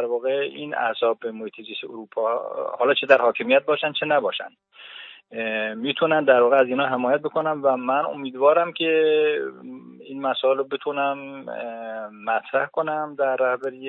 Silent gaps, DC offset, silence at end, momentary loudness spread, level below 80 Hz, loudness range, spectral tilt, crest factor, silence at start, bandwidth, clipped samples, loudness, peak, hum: none; under 0.1%; 0 s; 16 LU; -80 dBFS; 5 LU; -6.5 dB/octave; 20 dB; 0 s; 5 kHz; under 0.1%; -22 LUFS; -2 dBFS; none